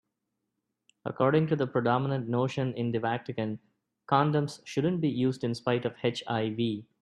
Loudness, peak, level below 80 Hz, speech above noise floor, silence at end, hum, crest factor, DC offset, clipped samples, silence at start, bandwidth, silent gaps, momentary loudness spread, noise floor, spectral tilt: -29 LUFS; -8 dBFS; -68 dBFS; 54 dB; 0.2 s; none; 22 dB; under 0.1%; under 0.1%; 1.05 s; 11 kHz; none; 8 LU; -83 dBFS; -7 dB/octave